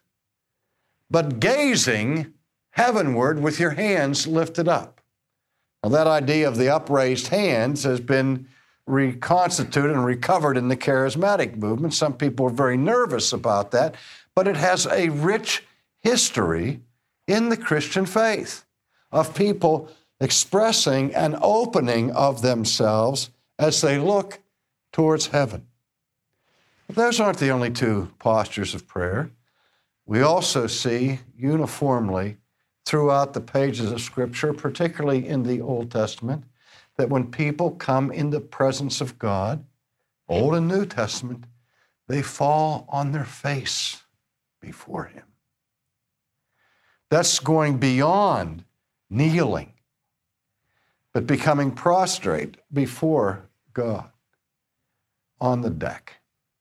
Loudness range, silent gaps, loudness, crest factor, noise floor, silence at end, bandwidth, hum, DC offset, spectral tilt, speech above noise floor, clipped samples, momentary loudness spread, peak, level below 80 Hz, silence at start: 5 LU; none; -22 LUFS; 18 dB; -81 dBFS; 0.6 s; 15.5 kHz; none; under 0.1%; -4.5 dB/octave; 59 dB; under 0.1%; 10 LU; -6 dBFS; -58 dBFS; 1.1 s